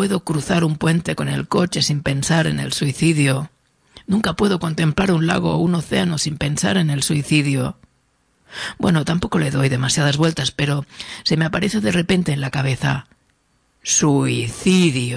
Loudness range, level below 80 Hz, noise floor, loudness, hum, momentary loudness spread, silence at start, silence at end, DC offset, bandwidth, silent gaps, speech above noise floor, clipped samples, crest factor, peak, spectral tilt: 2 LU; -46 dBFS; -63 dBFS; -19 LUFS; none; 6 LU; 0 s; 0 s; under 0.1%; 11 kHz; none; 44 dB; under 0.1%; 18 dB; -2 dBFS; -5 dB/octave